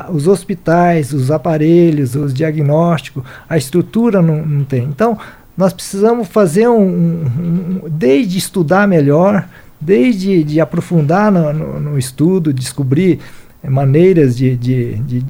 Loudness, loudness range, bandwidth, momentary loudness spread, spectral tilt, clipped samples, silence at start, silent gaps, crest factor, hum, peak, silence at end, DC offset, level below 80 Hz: -13 LUFS; 2 LU; 16.5 kHz; 8 LU; -7.5 dB/octave; under 0.1%; 0 s; none; 12 dB; none; 0 dBFS; 0 s; under 0.1%; -44 dBFS